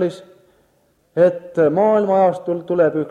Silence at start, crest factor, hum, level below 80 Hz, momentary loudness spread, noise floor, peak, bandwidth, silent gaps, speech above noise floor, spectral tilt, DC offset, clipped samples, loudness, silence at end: 0 s; 14 dB; none; -64 dBFS; 9 LU; -60 dBFS; -4 dBFS; 9.4 kHz; none; 44 dB; -8.5 dB/octave; under 0.1%; under 0.1%; -17 LUFS; 0 s